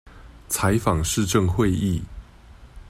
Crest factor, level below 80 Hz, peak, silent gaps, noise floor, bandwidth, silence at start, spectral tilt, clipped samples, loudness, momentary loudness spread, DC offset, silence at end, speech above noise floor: 18 dB; -38 dBFS; -6 dBFS; none; -46 dBFS; 16 kHz; 0.1 s; -5 dB/octave; under 0.1%; -22 LUFS; 8 LU; under 0.1%; 0 s; 25 dB